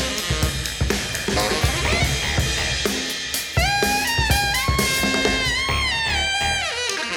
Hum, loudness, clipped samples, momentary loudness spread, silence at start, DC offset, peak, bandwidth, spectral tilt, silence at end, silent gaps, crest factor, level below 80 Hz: none; -20 LUFS; under 0.1%; 4 LU; 0 s; under 0.1%; -4 dBFS; over 20 kHz; -3 dB/octave; 0 s; none; 16 dB; -30 dBFS